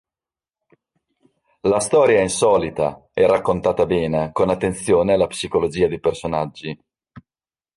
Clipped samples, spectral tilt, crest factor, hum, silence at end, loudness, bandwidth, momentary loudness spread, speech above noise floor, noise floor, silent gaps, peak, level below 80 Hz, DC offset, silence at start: under 0.1%; -5 dB/octave; 16 dB; none; 0.55 s; -19 LUFS; 11.5 kHz; 9 LU; over 72 dB; under -90 dBFS; none; -4 dBFS; -46 dBFS; under 0.1%; 1.65 s